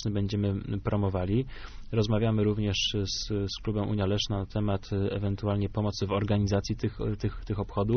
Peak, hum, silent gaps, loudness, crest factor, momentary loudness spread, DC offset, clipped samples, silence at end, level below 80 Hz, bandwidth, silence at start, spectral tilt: -14 dBFS; none; none; -30 LUFS; 14 dB; 6 LU; under 0.1%; under 0.1%; 0 s; -42 dBFS; 6.6 kHz; 0 s; -6 dB/octave